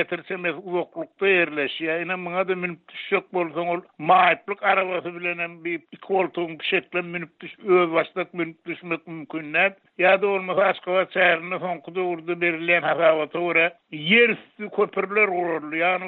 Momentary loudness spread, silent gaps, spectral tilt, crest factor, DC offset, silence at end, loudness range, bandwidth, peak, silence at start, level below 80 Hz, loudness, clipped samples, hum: 12 LU; none; -2 dB/octave; 18 dB; under 0.1%; 0 s; 4 LU; 4.3 kHz; -6 dBFS; 0 s; -76 dBFS; -23 LUFS; under 0.1%; none